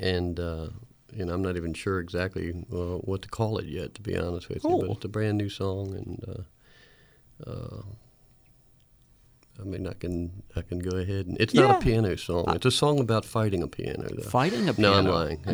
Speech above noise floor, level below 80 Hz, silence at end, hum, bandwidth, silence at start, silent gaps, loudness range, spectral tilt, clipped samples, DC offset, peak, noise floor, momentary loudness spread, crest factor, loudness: 33 dB; -46 dBFS; 0 s; none; over 20 kHz; 0 s; none; 17 LU; -6 dB/octave; under 0.1%; under 0.1%; -4 dBFS; -60 dBFS; 17 LU; 24 dB; -27 LUFS